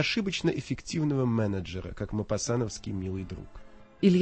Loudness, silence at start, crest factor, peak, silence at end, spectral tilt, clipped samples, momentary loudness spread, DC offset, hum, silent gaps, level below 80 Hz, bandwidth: -30 LUFS; 0 s; 20 dB; -10 dBFS; 0 s; -5.5 dB/octave; under 0.1%; 11 LU; under 0.1%; none; none; -50 dBFS; 8.8 kHz